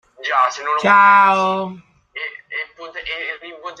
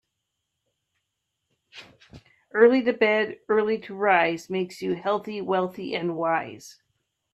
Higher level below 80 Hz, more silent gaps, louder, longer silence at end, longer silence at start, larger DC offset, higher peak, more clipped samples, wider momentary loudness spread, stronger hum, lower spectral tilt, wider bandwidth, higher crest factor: first, -60 dBFS vs -70 dBFS; neither; first, -15 LUFS vs -24 LUFS; second, 0.05 s vs 0.6 s; second, 0.2 s vs 1.75 s; neither; about the same, -2 dBFS vs -4 dBFS; neither; first, 20 LU vs 11 LU; neither; second, -4 dB/octave vs -5.5 dB/octave; second, 9 kHz vs 12.5 kHz; second, 16 dB vs 22 dB